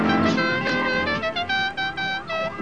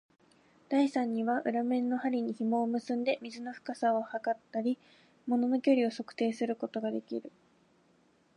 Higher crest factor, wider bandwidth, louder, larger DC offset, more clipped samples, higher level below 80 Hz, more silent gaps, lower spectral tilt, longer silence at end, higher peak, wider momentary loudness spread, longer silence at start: about the same, 14 dB vs 18 dB; about the same, 9.6 kHz vs 10.5 kHz; first, -23 LUFS vs -32 LUFS; first, 0.5% vs under 0.1%; neither; first, -52 dBFS vs -86 dBFS; neither; about the same, -5 dB/octave vs -6 dB/octave; second, 0 s vs 1.05 s; first, -8 dBFS vs -16 dBFS; second, 6 LU vs 10 LU; second, 0 s vs 0.7 s